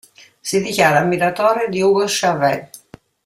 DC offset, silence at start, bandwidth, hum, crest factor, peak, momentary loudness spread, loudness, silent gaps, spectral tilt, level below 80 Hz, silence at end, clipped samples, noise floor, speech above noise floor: under 0.1%; 0.45 s; 16 kHz; none; 16 dB; -2 dBFS; 7 LU; -16 LUFS; none; -4 dB/octave; -58 dBFS; 0.5 s; under 0.1%; -44 dBFS; 28 dB